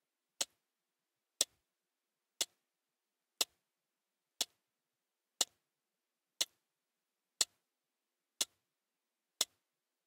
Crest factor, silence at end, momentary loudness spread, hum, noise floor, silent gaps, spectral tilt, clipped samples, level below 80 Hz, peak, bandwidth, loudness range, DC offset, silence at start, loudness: 34 dB; 0.65 s; 4 LU; none; under -90 dBFS; none; 2.5 dB/octave; under 0.1%; under -90 dBFS; -12 dBFS; 16 kHz; 2 LU; under 0.1%; 0.4 s; -39 LUFS